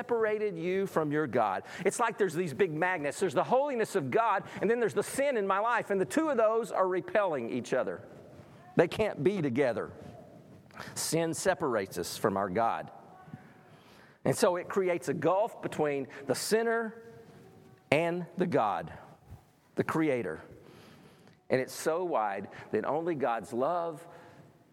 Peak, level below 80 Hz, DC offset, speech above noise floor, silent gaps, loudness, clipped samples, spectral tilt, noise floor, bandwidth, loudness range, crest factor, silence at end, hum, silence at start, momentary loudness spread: -6 dBFS; -70 dBFS; under 0.1%; 28 dB; none; -31 LUFS; under 0.1%; -5 dB/octave; -58 dBFS; 16.5 kHz; 4 LU; 26 dB; 0.4 s; none; 0 s; 11 LU